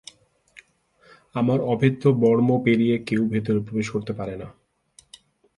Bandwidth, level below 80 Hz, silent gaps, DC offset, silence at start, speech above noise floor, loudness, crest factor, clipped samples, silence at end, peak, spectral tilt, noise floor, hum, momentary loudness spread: 11.5 kHz; -58 dBFS; none; under 0.1%; 1.35 s; 38 dB; -22 LUFS; 20 dB; under 0.1%; 1.05 s; -4 dBFS; -8 dB/octave; -59 dBFS; none; 14 LU